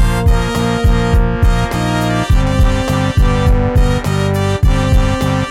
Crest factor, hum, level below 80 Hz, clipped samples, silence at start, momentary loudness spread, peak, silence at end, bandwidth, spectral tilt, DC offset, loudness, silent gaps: 10 dB; none; -16 dBFS; under 0.1%; 0 s; 2 LU; -2 dBFS; 0 s; 15 kHz; -6.5 dB/octave; under 0.1%; -14 LUFS; none